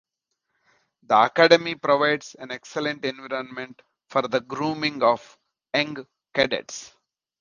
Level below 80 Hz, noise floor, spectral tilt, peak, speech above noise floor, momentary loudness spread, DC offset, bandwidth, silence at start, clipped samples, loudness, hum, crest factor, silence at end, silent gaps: -66 dBFS; -79 dBFS; -4 dB/octave; -2 dBFS; 56 dB; 19 LU; under 0.1%; 7.4 kHz; 1.1 s; under 0.1%; -23 LUFS; none; 24 dB; 0.55 s; none